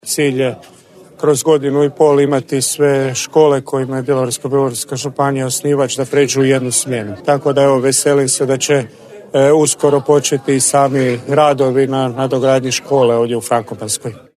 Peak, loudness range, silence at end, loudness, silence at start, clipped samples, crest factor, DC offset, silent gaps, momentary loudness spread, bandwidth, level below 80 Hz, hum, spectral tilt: 0 dBFS; 2 LU; 0.2 s; -14 LUFS; 0.05 s; under 0.1%; 14 dB; under 0.1%; none; 7 LU; 13.5 kHz; -60 dBFS; none; -4.5 dB/octave